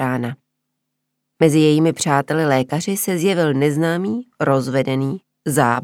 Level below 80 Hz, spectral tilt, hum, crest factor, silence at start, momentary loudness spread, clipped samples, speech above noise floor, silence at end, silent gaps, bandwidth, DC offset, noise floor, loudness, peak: -66 dBFS; -5.5 dB/octave; none; 18 dB; 0 s; 10 LU; under 0.1%; 59 dB; 0 s; none; 17 kHz; under 0.1%; -76 dBFS; -18 LUFS; 0 dBFS